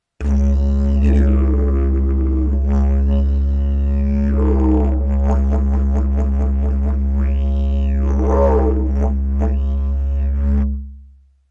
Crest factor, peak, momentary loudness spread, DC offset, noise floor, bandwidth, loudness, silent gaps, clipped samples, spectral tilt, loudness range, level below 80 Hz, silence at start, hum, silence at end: 12 dB; -4 dBFS; 4 LU; under 0.1%; -45 dBFS; 3 kHz; -18 LUFS; none; under 0.1%; -10.5 dB/octave; 1 LU; -16 dBFS; 0.2 s; none; 0.45 s